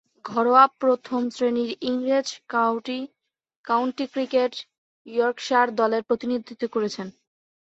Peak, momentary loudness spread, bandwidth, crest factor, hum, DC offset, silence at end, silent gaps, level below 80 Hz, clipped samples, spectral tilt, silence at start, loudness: -4 dBFS; 12 LU; 8 kHz; 22 dB; none; under 0.1%; 0.65 s; 3.56-3.64 s, 4.78-5.05 s; -72 dBFS; under 0.1%; -4 dB/octave; 0.25 s; -23 LUFS